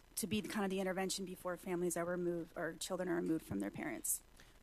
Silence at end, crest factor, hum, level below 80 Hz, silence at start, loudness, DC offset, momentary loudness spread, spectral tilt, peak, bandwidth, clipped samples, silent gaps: 0.05 s; 16 dB; none; -66 dBFS; 0.15 s; -40 LUFS; under 0.1%; 5 LU; -4 dB/octave; -24 dBFS; 14 kHz; under 0.1%; none